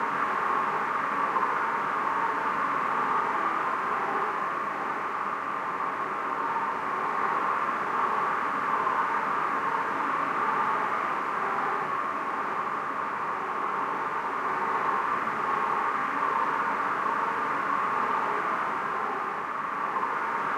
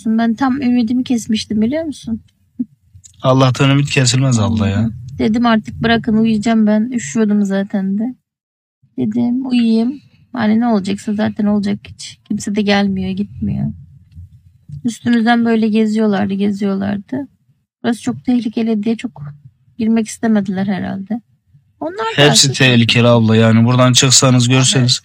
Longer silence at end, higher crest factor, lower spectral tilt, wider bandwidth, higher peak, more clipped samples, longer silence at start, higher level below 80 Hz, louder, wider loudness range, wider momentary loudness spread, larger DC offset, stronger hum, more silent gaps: about the same, 0 s vs 0.05 s; about the same, 14 dB vs 14 dB; about the same, -4.5 dB/octave vs -4.5 dB/octave; second, 14 kHz vs 16.5 kHz; second, -14 dBFS vs 0 dBFS; neither; about the same, 0 s vs 0.05 s; second, -70 dBFS vs -52 dBFS; second, -28 LUFS vs -14 LUFS; second, 2 LU vs 7 LU; second, 4 LU vs 15 LU; neither; neither; second, none vs 8.43-8.82 s